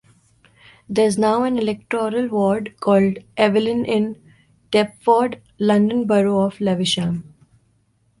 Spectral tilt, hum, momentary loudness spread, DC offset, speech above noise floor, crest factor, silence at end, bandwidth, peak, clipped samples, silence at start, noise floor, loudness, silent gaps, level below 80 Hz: -6 dB/octave; none; 6 LU; under 0.1%; 44 dB; 18 dB; 1 s; 11.5 kHz; -2 dBFS; under 0.1%; 0.9 s; -62 dBFS; -19 LUFS; none; -58 dBFS